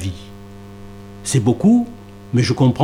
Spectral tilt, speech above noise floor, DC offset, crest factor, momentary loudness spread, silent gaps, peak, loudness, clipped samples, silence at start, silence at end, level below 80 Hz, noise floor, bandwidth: -6.5 dB/octave; 22 dB; under 0.1%; 16 dB; 23 LU; none; -4 dBFS; -18 LUFS; under 0.1%; 0 s; 0 s; -46 dBFS; -37 dBFS; 14 kHz